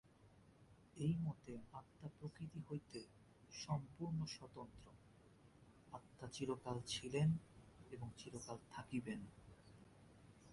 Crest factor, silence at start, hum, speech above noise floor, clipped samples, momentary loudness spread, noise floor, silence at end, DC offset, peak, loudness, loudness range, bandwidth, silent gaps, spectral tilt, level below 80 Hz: 20 dB; 0.2 s; none; 22 dB; under 0.1%; 25 LU; -68 dBFS; 0 s; under 0.1%; -28 dBFS; -48 LUFS; 5 LU; 11.5 kHz; none; -6 dB/octave; -72 dBFS